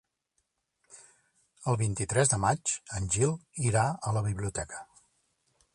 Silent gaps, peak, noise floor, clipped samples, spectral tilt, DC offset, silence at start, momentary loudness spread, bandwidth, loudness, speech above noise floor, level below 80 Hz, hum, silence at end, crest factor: none; -12 dBFS; -79 dBFS; under 0.1%; -4.5 dB/octave; under 0.1%; 0.9 s; 11 LU; 11.5 kHz; -29 LUFS; 50 dB; -52 dBFS; none; 0.9 s; 20 dB